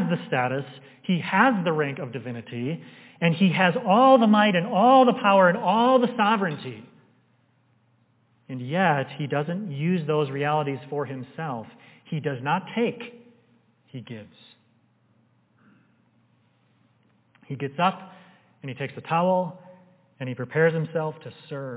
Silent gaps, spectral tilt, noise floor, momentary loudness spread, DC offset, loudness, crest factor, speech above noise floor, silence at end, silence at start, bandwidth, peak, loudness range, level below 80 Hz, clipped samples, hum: none; -10.5 dB/octave; -64 dBFS; 21 LU; under 0.1%; -23 LUFS; 20 dB; 41 dB; 0 s; 0 s; 4 kHz; -4 dBFS; 14 LU; -78 dBFS; under 0.1%; none